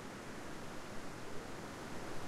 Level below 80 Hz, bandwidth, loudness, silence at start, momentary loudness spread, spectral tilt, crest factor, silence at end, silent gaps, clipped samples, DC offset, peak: -58 dBFS; 15 kHz; -48 LUFS; 0 s; 1 LU; -4.5 dB/octave; 14 dB; 0 s; none; under 0.1%; under 0.1%; -30 dBFS